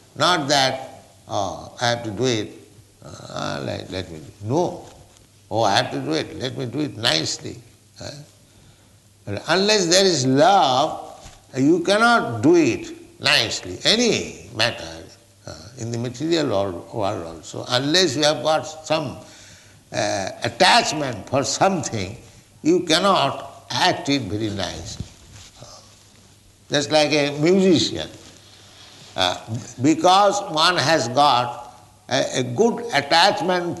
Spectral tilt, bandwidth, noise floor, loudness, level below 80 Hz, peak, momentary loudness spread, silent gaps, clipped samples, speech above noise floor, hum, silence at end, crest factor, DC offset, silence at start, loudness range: -3.5 dB/octave; 12 kHz; -52 dBFS; -20 LUFS; -56 dBFS; -2 dBFS; 18 LU; none; under 0.1%; 32 dB; none; 0 s; 18 dB; under 0.1%; 0.15 s; 7 LU